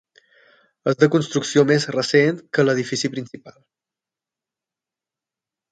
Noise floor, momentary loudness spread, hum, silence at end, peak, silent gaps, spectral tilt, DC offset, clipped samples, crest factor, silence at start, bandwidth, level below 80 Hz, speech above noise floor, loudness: -89 dBFS; 10 LU; none; 2.2 s; -2 dBFS; none; -5 dB/octave; under 0.1%; under 0.1%; 20 dB; 0.85 s; 9.2 kHz; -66 dBFS; 69 dB; -19 LUFS